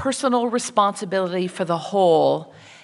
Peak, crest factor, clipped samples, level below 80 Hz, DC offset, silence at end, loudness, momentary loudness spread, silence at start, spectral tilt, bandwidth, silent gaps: -4 dBFS; 18 dB; under 0.1%; -72 dBFS; under 0.1%; 0.35 s; -21 LUFS; 8 LU; 0 s; -4.5 dB/octave; 11.5 kHz; none